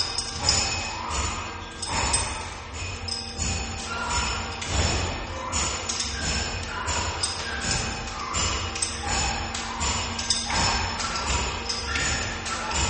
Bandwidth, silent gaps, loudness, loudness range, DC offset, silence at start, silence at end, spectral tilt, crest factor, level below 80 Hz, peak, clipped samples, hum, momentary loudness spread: 8.8 kHz; none; -26 LUFS; 3 LU; under 0.1%; 0 s; 0 s; -2 dB/octave; 22 dB; -36 dBFS; -6 dBFS; under 0.1%; none; 7 LU